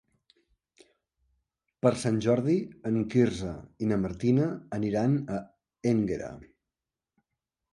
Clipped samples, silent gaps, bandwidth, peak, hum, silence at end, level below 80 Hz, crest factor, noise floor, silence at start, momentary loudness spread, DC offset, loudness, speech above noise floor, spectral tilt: under 0.1%; none; 11.5 kHz; -10 dBFS; none; 1.3 s; -56 dBFS; 20 dB; -90 dBFS; 1.85 s; 10 LU; under 0.1%; -28 LUFS; 63 dB; -7.5 dB/octave